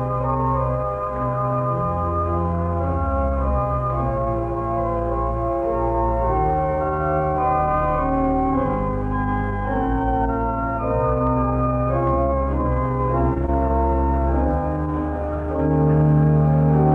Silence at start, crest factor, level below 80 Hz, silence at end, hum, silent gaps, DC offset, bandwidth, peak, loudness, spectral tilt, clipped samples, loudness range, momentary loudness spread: 0 s; 14 dB; -28 dBFS; 0 s; none; none; under 0.1%; 3.4 kHz; -6 dBFS; -21 LUFS; -11 dB/octave; under 0.1%; 2 LU; 6 LU